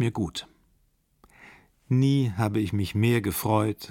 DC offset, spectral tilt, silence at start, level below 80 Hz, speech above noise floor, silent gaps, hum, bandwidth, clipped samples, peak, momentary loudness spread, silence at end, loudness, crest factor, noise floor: under 0.1%; -6.5 dB/octave; 0 s; -54 dBFS; 42 dB; none; none; 17.5 kHz; under 0.1%; -8 dBFS; 7 LU; 0 s; -25 LUFS; 18 dB; -67 dBFS